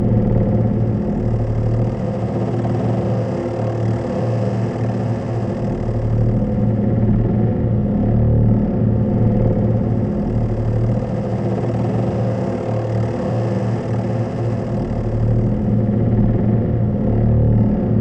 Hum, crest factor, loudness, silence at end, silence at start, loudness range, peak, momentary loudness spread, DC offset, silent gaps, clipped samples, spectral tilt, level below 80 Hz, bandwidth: none; 14 dB; -18 LUFS; 0 s; 0 s; 3 LU; -2 dBFS; 5 LU; under 0.1%; none; under 0.1%; -10.5 dB/octave; -28 dBFS; 6 kHz